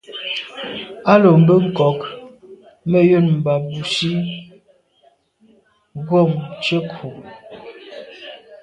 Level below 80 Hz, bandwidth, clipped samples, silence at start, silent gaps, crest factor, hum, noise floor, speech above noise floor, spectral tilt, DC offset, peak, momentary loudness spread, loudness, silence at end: -58 dBFS; 10 kHz; under 0.1%; 0.1 s; none; 18 dB; none; -57 dBFS; 41 dB; -7 dB/octave; under 0.1%; 0 dBFS; 25 LU; -17 LUFS; 0.05 s